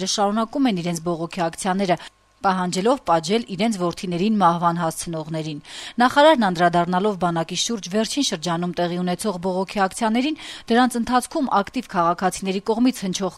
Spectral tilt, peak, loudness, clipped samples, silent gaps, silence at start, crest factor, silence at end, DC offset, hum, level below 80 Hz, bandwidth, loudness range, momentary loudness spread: -4.5 dB/octave; -4 dBFS; -21 LUFS; under 0.1%; none; 0 s; 18 dB; 0 s; under 0.1%; none; -54 dBFS; 15 kHz; 3 LU; 8 LU